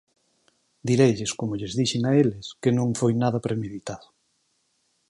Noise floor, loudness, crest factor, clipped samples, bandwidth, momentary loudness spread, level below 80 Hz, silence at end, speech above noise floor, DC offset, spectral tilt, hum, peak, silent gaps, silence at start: -71 dBFS; -24 LUFS; 20 dB; under 0.1%; 11.5 kHz; 14 LU; -58 dBFS; 1.1 s; 47 dB; under 0.1%; -6 dB/octave; none; -6 dBFS; none; 0.85 s